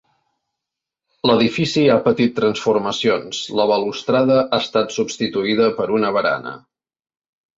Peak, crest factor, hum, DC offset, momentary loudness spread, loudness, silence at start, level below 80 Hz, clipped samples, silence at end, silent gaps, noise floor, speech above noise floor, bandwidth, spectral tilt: -2 dBFS; 16 dB; none; under 0.1%; 6 LU; -18 LUFS; 1.25 s; -58 dBFS; under 0.1%; 1 s; none; -84 dBFS; 66 dB; 8 kHz; -5 dB/octave